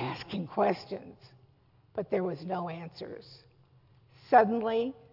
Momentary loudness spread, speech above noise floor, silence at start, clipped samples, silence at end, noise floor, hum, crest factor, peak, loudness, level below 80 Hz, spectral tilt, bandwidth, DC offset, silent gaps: 20 LU; 33 dB; 0 s; under 0.1%; 0.2 s; -64 dBFS; none; 24 dB; -8 dBFS; -30 LUFS; -72 dBFS; -4.5 dB/octave; 5.8 kHz; under 0.1%; none